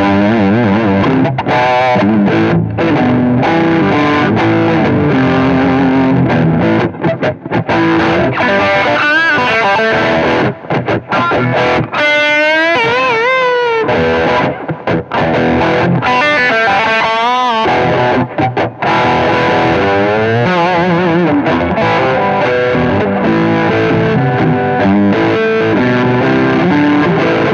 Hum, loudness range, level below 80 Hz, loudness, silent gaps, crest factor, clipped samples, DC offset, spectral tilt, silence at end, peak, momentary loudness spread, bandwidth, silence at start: none; 1 LU; -40 dBFS; -11 LUFS; none; 10 dB; under 0.1%; under 0.1%; -7 dB/octave; 0 s; 0 dBFS; 4 LU; 8.6 kHz; 0 s